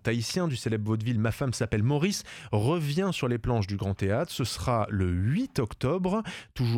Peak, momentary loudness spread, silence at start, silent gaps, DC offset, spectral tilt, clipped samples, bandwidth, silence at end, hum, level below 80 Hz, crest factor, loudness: -12 dBFS; 4 LU; 0.05 s; none; under 0.1%; -6 dB/octave; under 0.1%; 16.5 kHz; 0 s; none; -48 dBFS; 16 dB; -29 LUFS